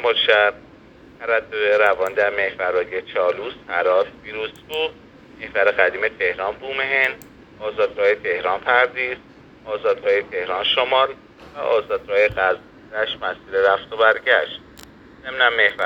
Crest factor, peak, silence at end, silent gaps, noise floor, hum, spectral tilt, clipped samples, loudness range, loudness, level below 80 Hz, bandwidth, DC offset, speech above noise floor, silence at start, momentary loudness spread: 20 dB; 0 dBFS; 0 s; none; -46 dBFS; none; -3.5 dB/octave; under 0.1%; 2 LU; -20 LUFS; -56 dBFS; 17.5 kHz; under 0.1%; 26 dB; 0 s; 12 LU